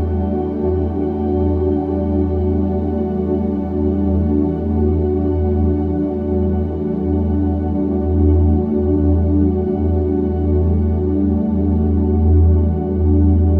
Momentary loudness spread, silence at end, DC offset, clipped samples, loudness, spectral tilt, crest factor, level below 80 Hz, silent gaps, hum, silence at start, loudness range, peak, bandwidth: 5 LU; 0 s; under 0.1%; under 0.1%; -17 LUFS; -13 dB/octave; 12 dB; -22 dBFS; none; none; 0 s; 2 LU; -4 dBFS; 2.4 kHz